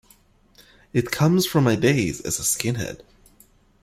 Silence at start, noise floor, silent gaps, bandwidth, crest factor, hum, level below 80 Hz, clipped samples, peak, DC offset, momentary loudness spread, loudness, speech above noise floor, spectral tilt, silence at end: 0.95 s; -56 dBFS; none; 16 kHz; 20 dB; none; -52 dBFS; under 0.1%; -4 dBFS; under 0.1%; 10 LU; -22 LUFS; 35 dB; -4.5 dB/octave; 0.85 s